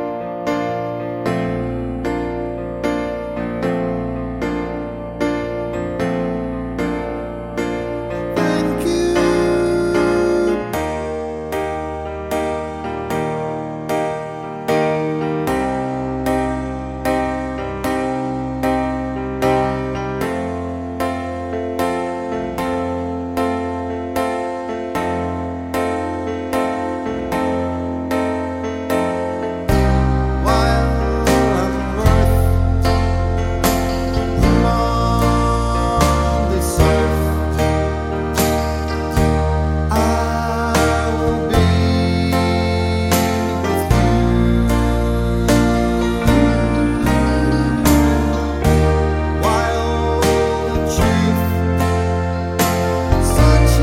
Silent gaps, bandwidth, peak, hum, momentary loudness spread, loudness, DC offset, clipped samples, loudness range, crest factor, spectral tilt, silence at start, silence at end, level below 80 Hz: none; 16.5 kHz; 0 dBFS; none; 8 LU; -18 LUFS; under 0.1%; under 0.1%; 6 LU; 16 dB; -6 dB/octave; 0 s; 0 s; -24 dBFS